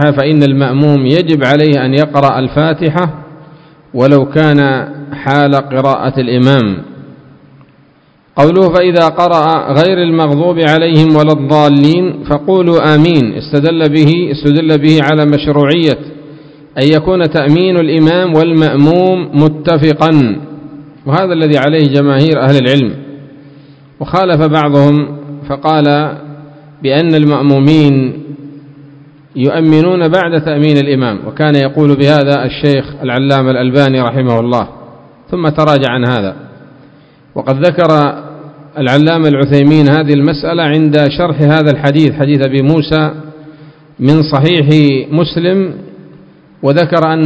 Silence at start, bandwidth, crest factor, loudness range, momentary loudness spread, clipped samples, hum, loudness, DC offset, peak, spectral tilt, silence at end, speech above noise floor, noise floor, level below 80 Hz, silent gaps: 0 s; 8 kHz; 10 dB; 4 LU; 9 LU; 2%; none; -9 LUFS; under 0.1%; 0 dBFS; -8.5 dB/octave; 0 s; 38 dB; -47 dBFS; -42 dBFS; none